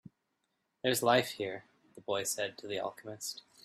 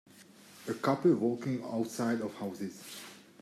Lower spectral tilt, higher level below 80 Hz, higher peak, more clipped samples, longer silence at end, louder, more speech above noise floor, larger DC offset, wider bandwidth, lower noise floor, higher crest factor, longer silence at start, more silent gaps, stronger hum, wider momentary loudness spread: second, -3 dB/octave vs -6 dB/octave; about the same, -76 dBFS vs -80 dBFS; first, -12 dBFS vs -16 dBFS; neither; about the same, 0.25 s vs 0.2 s; about the same, -34 LUFS vs -33 LUFS; first, 48 dB vs 24 dB; neither; about the same, 15.5 kHz vs 14.5 kHz; first, -82 dBFS vs -56 dBFS; first, 24 dB vs 18 dB; first, 0.85 s vs 0.15 s; neither; neither; second, 13 LU vs 18 LU